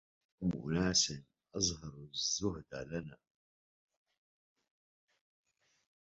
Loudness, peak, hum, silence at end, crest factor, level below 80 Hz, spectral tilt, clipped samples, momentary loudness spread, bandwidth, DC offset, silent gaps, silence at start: -36 LUFS; -18 dBFS; none; 2.85 s; 24 dB; -60 dBFS; -4 dB/octave; under 0.1%; 17 LU; 7.6 kHz; under 0.1%; none; 0.4 s